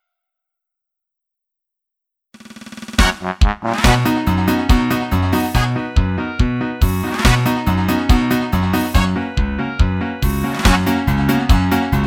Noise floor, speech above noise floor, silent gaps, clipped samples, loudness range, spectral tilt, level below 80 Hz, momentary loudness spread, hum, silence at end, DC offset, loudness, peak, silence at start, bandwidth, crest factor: -81 dBFS; 67 dB; none; under 0.1%; 4 LU; -5.5 dB/octave; -22 dBFS; 6 LU; none; 0 s; under 0.1%; -17 LUFS; 0 dBFS; 2.5 s; 18.5 kHz; 16 dB